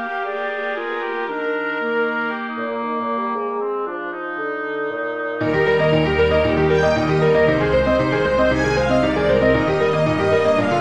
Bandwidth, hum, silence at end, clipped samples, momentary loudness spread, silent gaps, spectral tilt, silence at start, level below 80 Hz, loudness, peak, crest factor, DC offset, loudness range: 9.6 kHz; none; 0 s; under 0.1%; 8 LU; none; -6.5 dB/octave; 0 s; -38 dBFS; -19 LUFS; -4 dBFS; 16 dB; 0.3%; 6 LU